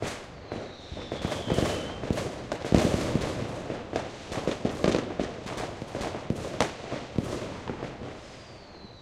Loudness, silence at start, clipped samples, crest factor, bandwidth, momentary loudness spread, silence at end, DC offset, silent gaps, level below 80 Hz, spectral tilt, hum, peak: -31 LUFS; 0 s; under 0.1%; 26 dB; 15.5 kHz; 14 LU; 0 s; under 0.1%; none; -46 dBFS; -5.5 dB/octave; none; -4 dBFS